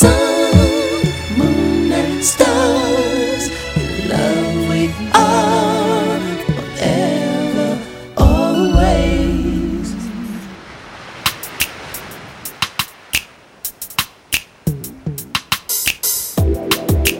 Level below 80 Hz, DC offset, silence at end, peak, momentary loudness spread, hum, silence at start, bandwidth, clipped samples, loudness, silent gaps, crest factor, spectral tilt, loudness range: -26 dBFS; under 0.1%; 0 s; 0 dBFS; 14 LU; none; 0 s; 18.5 kHz; under 0.1%; -16 LUFS; none; 16 dB; -4.5 dB/octave; 7 LU